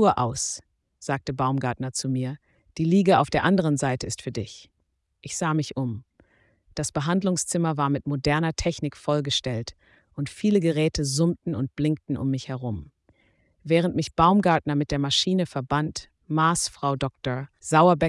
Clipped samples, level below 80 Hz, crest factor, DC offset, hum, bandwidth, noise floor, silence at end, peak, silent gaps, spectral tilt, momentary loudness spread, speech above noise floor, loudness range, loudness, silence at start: under 0.1%; -50 dBFS; 18 dB; under 0.1%; none; 12 kHz; -74 dBFS; 0 s; -6 dBFS; none; -5 dB/octave; 13 LU; 50 dB; 4 LU; -25 LUFS; 0 s